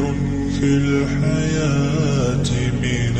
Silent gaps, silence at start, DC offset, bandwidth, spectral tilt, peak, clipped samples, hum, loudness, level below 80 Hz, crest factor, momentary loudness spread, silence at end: none; 0 s; under 0.1%; 8.8 kHz; -6.5 dB/octave; -6 dBFS; under 0.1%; none; -19 LUFS; -32 dBFS; 12 dB; 3 LU; 0 s